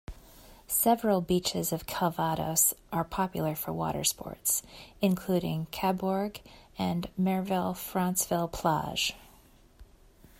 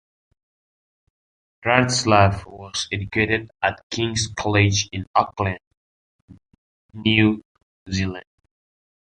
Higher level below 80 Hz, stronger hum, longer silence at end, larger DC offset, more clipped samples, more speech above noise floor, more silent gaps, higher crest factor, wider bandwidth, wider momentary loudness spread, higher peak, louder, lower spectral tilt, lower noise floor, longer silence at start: second, -54 dBFS vs -44 dBFS; neither; second, 0.55 s vs 0.8 s; neither; neither; second, 28 dB vs over 69 dB; second, none vs 3.83-3.90 s, 5.07-5.14 s, 5.67-5.71 s, 5.77-6.28 s, 6.58-6.89 s, 7.45-7.55 s, 7.63-7.86 s; about the same, 20 dB vs 22 dB; first, 16 kHz vs 10.5 kHz; second, 8 LU vs 12 LU; second, -12 dBFS vs -2 dBFS; second, -29 LUFS vs -21 LUFS; about the same, -4 dB/octave vs -4.5 dB/octave; second, -58 dBFS vs under -90 dBFS; second, 0.1 s vs 1.65 s